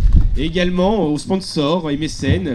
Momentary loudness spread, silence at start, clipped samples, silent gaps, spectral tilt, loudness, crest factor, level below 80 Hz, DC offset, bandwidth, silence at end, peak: 4 LU; 0 s; 0.1%; none; -6.5 dB/octave; -18 LUFS; 16 dB; -20 dBFS; under 0.1%; 11.5 kHz; 0 s; 0 dBFS